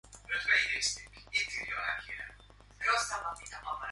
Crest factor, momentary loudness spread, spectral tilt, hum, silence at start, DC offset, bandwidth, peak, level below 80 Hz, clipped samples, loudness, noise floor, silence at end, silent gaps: 22 dB; 15 LU; 0.5 dB/octave; 50 Hz at -55 dBFS; 0.05 s; under 0.1%; 11.5 kHz; -14 dBFS; -58 dBFS; under 0.1%; -32 LUFS; -56 dBFS; 0 s; none